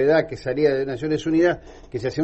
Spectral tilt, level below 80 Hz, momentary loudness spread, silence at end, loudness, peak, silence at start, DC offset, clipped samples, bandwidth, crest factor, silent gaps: -7 dB/octave; -48 dBFS; 10 LU; 0 s; -22 LUFS; -6 dBFS; 0 s; under 0.1%; under 0.1%; 8.2 kHz; 14 dB; none